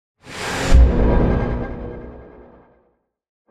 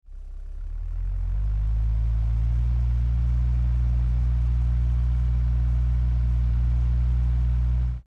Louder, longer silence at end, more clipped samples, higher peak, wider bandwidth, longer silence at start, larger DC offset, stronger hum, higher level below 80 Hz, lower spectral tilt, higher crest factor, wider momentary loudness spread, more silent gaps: first, -19 LUFS vs -25 LUFS; first, 1.25 s vs 0.05 s; neither; first, -2 dBFS vs -16 dBFS; first, 11 kHz vs 3 kHz; first, 0.25 s vs 0.1 s; neither; neither; about the same, -20 dBFS vs -24 dBFS; second, -6.5 dB/octave vs -9 dB/octave; first, 16 dB vs 8 dB; first, 21 LU vs 8 LU; neither